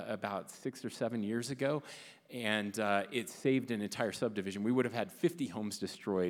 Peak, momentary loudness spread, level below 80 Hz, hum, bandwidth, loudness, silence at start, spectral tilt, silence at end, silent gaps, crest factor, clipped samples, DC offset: -14 dBFS; 8 LU; -82 dBFS; none; 18 kHz; -36 LUFS; 0 s; -5 dB/octave; 0 s; none; 22 dB; under 0.1%; under 0.1%